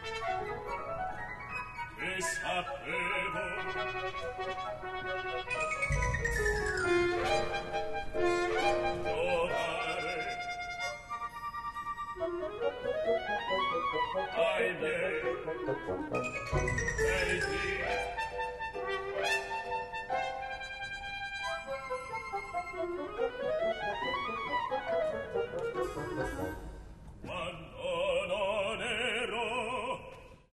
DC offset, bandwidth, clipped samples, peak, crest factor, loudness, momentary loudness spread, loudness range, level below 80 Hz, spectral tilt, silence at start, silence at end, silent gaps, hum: under 0.1%; 13 kHz; under 0.1%; -18 dBFS; 18 dB; -34 LUFS; 8 LU; 5 LU; -48 dBFS; -4 dB/octave; 0 s; 0.15 s; none; none